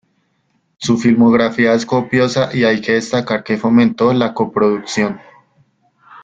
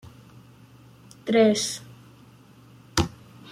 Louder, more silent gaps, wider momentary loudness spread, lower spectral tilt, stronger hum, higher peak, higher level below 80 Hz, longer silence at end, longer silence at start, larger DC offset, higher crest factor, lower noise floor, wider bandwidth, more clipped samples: first, -15 LUFS vs -24 LUFS; neither; second, 7 LU vs 18 LU; about the same, -5.5 dB/octave vs -4.5 dB/octave; neither; first, 0 dBFS vs -6 dBFS; about the same, -52 dBFS vs -50 dBFS; about the same, 0.05 s vs 0 s; first, 0.8 s vs 0.05 s; neither; second, 14 dB vs 22 dB; first, -63 dBFS vs -51 dBFS; second, 7.8 kHz vs 16 kHz; neither